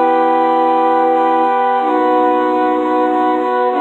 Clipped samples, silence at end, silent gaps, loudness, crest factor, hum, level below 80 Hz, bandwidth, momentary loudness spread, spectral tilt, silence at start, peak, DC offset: under 0.1%; 0 s; none; -13 LUFS; 10 dB; none; -58 dBFS; 7.8 kHz; 2 LU; -5.5 dB/octave; 0 s; -2 dBFS; under 0.1%